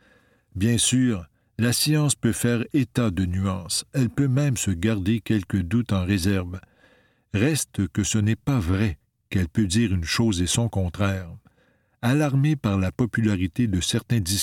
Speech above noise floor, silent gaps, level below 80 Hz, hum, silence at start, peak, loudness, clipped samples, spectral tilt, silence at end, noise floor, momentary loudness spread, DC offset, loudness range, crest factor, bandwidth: 41 dB; none; -44 dBFS; none; 0.55 s; -6 dBFS; -23 LUFS; under 0.1%; -5 dB/octave; 0 s; -64 dBFS; 7 LU; under 0.1%; 2 LU; 16 dB; 17.5 kHz